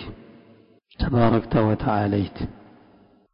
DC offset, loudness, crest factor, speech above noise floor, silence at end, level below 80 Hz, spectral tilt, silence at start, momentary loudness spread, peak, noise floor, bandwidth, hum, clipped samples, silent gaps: under 0.1%; -23 LUFS; 16 dB; 34 dB; 0.75 s; -38 dBFS; -12.5 dB/octave; 0 s; 15 LU; -8 dBFS; -55 dBFS; 5.4 kHz; none; under 0.1%; none